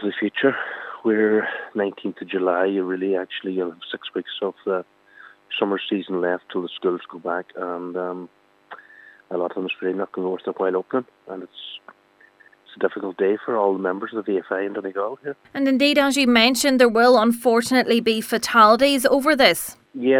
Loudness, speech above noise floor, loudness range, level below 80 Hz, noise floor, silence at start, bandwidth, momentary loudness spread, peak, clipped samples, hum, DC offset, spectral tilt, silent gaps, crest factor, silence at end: -21 LUFS; 33 dB; 12 LU; -64 dBFS; -54 dBFS; 0 s; 17.5 kHz; 15 LU; 0 dBFS; under 0.1%; none; under 0.1%; -3.5 dB/octave; none; 22 dB; 0 s